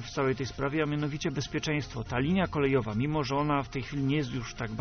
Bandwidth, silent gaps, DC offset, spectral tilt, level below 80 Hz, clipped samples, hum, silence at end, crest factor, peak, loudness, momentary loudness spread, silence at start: 6.6 kHz; none; under 0.1%; -5.5 dB/octave; -48 dBFS; under 0.1%; none; 0 s; 16 dB; -14 dBFS; -30 LUFS; 6 LU; 0 s